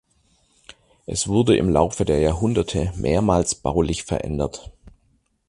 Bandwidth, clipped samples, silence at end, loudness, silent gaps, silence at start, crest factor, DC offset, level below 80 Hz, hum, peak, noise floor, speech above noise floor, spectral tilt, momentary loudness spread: 11.5 kHz; under 0.1%; 0.6 s; -21 LUFS; none; 1.1 s; 20 dB; under 0.1%; -36 dBFS; none; -2 dBFS; -64 dBFS; 44 dB; -5.5 dB/octave; 10 LU